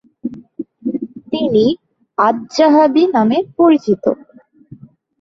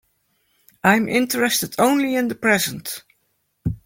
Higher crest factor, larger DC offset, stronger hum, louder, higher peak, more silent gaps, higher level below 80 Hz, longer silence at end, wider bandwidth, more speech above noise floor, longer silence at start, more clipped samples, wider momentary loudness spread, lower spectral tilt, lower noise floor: about the same, 14 dB vs 18 dB; neither; neither; first, -14 LUFS vs -19 LUFS; about the same, -2 dBFS vs -2 dBFS; neither; second, -58 dBFS vs -48 dBFS; first, 1.05 s vs 0.1 s; second, 7.6 kHz vs 17 kHz; second, 30 dB vs 50 dB; second, 0.25 s vs 0.85 s; neither; first, 17 LU vs 13 LU; first, -6.5 dB/octave vs -4 dB/octave; second, -43 dBFS vs -69 dBFS